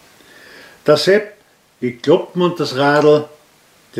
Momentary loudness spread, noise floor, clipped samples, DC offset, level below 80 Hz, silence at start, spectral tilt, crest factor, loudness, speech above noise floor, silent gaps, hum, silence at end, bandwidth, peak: 13 LU; -51 dBFS; under 0.1%; under 0.1%; -64 dBFS; 0.85 s; -5.5 dB/octave; 16 dB; -15 LUFS; 37 dB; none; none; 0 s; 15 kHz; 0 dBFS